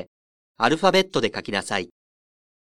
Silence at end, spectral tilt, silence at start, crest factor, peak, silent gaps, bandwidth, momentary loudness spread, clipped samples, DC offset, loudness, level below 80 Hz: 0.8 s; -4 dB/octave; 0 s; 22 dB; -2 dBFS; 0.07-0.55 s; 14 kHz; 10 LU; under 0.1%; under 0.1%; -22 LUFS; -58 dBFS